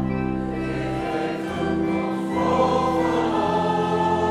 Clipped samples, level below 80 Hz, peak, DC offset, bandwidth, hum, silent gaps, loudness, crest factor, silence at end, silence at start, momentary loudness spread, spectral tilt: under 0.1%; -42 dBFS; -8 dBFS; under 0.1%; 12 kHz; none; none; -23 LUFS; 14 dB; 0 s; 0 s; 6 LU; -7 dB/octave